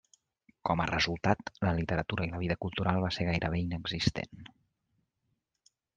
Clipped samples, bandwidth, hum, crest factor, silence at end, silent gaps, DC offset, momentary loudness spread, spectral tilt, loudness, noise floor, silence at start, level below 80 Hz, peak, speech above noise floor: under 0.1%; 9.2 kHz; none; 24 dB; 1.5 s; none; under 0.1%; 6 LU; -6 dB/octave; -32 LUFS; -81 dBFS; 0.65 s; -52 dBFS; -10 dBFS; 49 dB